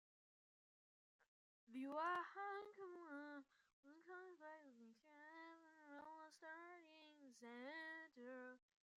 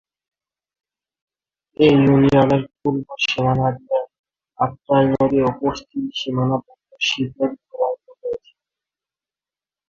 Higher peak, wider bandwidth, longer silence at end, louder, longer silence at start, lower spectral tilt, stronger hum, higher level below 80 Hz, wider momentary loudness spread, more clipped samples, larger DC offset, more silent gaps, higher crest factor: second, -36 dBFS vs -2 dBFS; first, 11 kHz vs 7.2 kHz; second, 0.4 s vs 1.5 s; second, -55 LUFS vs -19 LUFS; second, 1.2 s vs 1.8 s; second, -3.5 dB/octave vs -6.5 dB/octave; neither; second, under -90 dBFS vs -50 dBFS; first, 19 LU vs 14 LU; neither; neither; first, 1.28-1.67 s, 3.73-3.83 s vs 4.19-4.24 s; about the same, 22 dB vs 18 dB